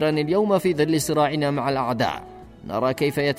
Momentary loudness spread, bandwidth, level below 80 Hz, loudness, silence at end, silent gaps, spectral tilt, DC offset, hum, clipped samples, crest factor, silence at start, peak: 7 LU; 16 kHz; -52 dBFS; -22 LUFS; 0 s; none; -5.5 dB/octave; under 0.1%; none; under 0.1%; 14 dB; 0 s; -8 dBFS